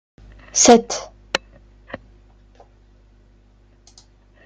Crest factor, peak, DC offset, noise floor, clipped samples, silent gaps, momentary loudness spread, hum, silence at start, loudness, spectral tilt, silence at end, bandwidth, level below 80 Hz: 22 dB; 0 dBFS; under 0.1%; -53 dBFS; under 0.1%; none; 27 LU; 50 Hz at -50 dBFS; 0.55 s; -16 LUFS; -2 dB/octave; 2.5 s; 10.5 kHz; -50 dBFS